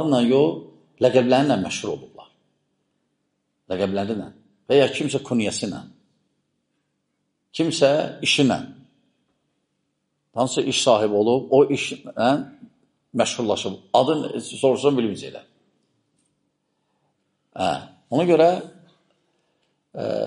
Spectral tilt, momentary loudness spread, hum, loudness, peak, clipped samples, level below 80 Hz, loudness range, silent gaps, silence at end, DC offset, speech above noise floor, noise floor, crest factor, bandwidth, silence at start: -4.5 dB/octave; 15 LU; none; -21 LUFS; -2 dBFS; under 0.1%; -66 dBFS; 5 LU; none; 0 s; under 0.1%; 54 dB; -74 dBFS; 20 dB; 10.5 kHz; 0 s